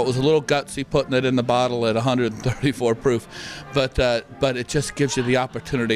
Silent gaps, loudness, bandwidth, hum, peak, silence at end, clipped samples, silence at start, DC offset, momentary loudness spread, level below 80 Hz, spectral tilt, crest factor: none; -22 LUFS; 14 kHz; none; -8 dBFS; 0 s; under 0.1%; 0 s; under 0.1%; 5 LU; -42 dBFS; -5.5 dB/octave; 14 dB